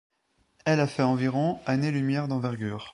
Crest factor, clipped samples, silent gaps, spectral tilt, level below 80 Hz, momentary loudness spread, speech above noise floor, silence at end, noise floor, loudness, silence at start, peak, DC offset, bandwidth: 16 dB; under 0.1%; none; -7 dB/octave; -62 dBFS; 6 LU; 40 dB; 0.05 s; -66 dBFS; -27 LUFS; 0.65 s; -10 dBFS; under 0.1%; 11 kHz